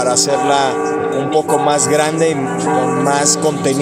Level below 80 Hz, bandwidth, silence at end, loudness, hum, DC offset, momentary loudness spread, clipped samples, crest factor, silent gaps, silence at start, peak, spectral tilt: -56 dBFS; 16 kHz; 0 s; -14 LUFS; none; under 0.1%; 4 LU; under 0.1%; 14 dB; none; 0 s; 0 dBFS; -3.5 dB/octave